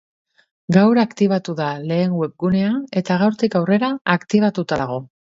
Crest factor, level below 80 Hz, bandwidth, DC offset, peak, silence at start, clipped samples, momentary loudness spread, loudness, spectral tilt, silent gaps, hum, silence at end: 18 dB; -56 dBFS; 7.8 kHz; under 0.1%; 0 dBFS; 0.7 s; under 0.1%; 8 LU; -19 LUFS; -7.5 dB/octave; 4.01-4.05 s; none; 0.35 s